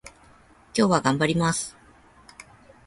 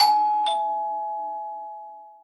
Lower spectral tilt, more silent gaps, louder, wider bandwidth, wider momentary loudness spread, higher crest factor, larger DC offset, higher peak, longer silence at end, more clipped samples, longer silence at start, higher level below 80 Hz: first, -4.5 dB/octave vs 0.5 dB/octave; neither; about the same, -23 LUFS vs -25 LUFS; about the same, 11.5 kHz vs 12 kHz; second, 9 LU vs 18 LU; about the same, 22 dB vs 18 dB; neither; about the same, -6 dBFS vs -6 dBFS; first, 1.15 s vs 0.1 s; neither; about the same, 0.05 s vs 0 s; first, -56 dBFS vs -78 dBFS